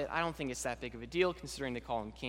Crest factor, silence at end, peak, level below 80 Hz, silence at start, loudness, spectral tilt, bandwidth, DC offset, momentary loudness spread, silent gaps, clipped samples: 22 dB; 0 s; -16 dBFS; -56 dBFS; 0 s; -37 LUFS; -4 dB/octave; 16 kHz; under 0.1%; 7 LU; none; under 0.1%